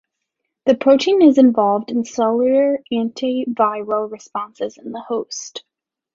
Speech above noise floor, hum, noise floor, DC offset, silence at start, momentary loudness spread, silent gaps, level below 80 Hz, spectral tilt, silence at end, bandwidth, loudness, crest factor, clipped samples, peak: 61 dB; none; -78 dBFS; under 0.1%; 0.65 s; 16 LU; none; -64 dBFS; -5 dB/octave; 0.55 s; 7.6 kHz; -17 LUFS; 16 dB; under 0.1%; -2 dBFS